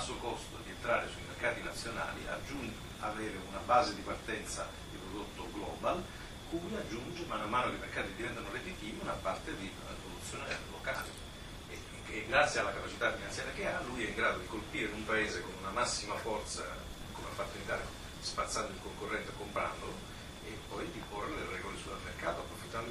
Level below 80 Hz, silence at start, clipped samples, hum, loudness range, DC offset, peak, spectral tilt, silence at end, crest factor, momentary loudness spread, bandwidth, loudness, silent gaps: -52 dBFS; 0 s; under 0.1%; none; 6 LU; under 0.1%; -14 dBFS; -3.5 dB/octave; 0 s; 26 dB; 11 LU; 15.5 kHz; -38 LUFS; none